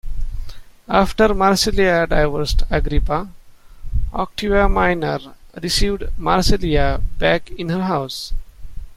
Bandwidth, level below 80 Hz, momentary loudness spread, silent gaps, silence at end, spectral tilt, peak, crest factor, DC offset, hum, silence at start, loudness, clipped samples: 14.5 kHz; -24 dBFS; 14 LU; none; 0 s; -5 dB/octave; 0 dBFS; 16 dB; under 0.1%; none; 0.05 s; -19 LUFS; under 0.1%